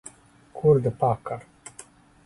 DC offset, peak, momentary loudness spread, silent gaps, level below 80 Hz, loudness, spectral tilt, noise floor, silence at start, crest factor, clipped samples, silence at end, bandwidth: under 0.1%; -8 dBFS; 23 LU; none; -56 dBFS; -24 LUFS; -8 dB/octave; -50 dBFS; 0.55 s; 18 dB; under 0.1%; 0.85 s; 11.5 kHz